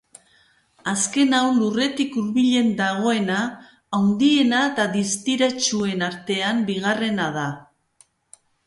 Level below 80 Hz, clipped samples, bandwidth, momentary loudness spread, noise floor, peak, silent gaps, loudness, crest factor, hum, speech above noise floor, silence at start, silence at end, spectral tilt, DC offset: -64 dBFS; under 0.1%; 11.5 kHz; 8 LU; -59 dBFS; -4 dBFS; none; -21 LUFS; 18 dB; none; 39 dB; 0.85 s; 1.05 s; -3.5 dB/octave; under 0.1%